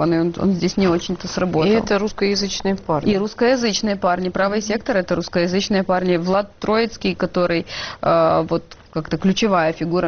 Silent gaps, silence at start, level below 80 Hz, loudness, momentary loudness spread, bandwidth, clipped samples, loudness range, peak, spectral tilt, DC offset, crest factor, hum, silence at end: none; 0 s; -44 dBFS; -19 LUFS; 6 LU; 6.8 kHz; under 0.1%; 1 LU; -6 dBFS; -4.5 dB/octave; under 0.1%; 12 dB; none; 0 s